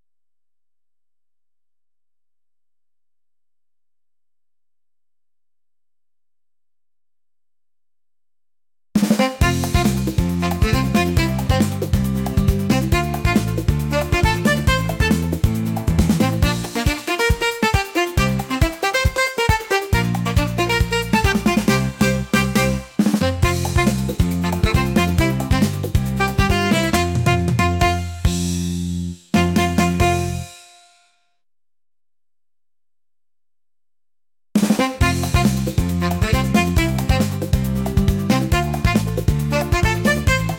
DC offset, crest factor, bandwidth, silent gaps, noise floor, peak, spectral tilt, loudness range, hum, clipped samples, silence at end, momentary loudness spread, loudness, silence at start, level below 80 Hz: under 0.1%; 16 dB; 17 kHz; none; under -90 dBFS; -4 dBFS; -5.5 dB/octave; 4 LU; none; under 0.1%; 0 s; 4 LU; -19 LUFS; 8.95 s; -28 dBFS